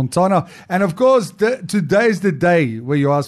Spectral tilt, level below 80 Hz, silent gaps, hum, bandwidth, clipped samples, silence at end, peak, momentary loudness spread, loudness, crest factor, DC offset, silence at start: -6.5 dB/octave; -58 dBFS; none; none; 13 kHz; under 0.1%; 0 s; -4 dBFS; 5 LU; -16 LUFS; 12 dB; under 0.1%; 0 s